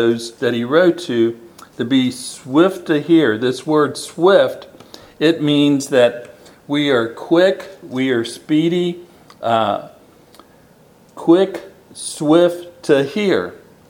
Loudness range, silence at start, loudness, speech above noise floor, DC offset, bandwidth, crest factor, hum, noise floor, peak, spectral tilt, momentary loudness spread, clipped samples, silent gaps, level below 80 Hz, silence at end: 5 LU; 0 s; -16 LUFS; 33 dB; under 0.1%; 16 kHz; 16 dB; none; -48 dBFS; 0 dBFS; -5.5 dB/octave; 14 LU; under 0.1%; none; -64 dBFS; 0.35 s